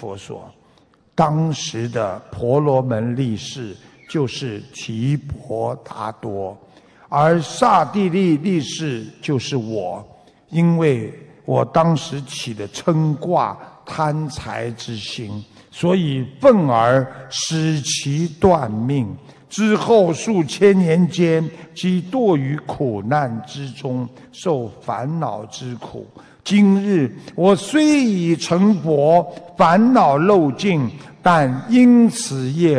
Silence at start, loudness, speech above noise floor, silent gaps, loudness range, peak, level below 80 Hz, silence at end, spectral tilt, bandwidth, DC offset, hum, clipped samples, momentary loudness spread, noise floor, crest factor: 0 s; -18 LUFS; 37 dB; none; 8 LU; -2 dBFS; -52 dBFS; 0 s; -6 dB/octave; 11 kHz; under 0.1%; none; under 0.1%; 15 LU; -55 dBFS; 16 dB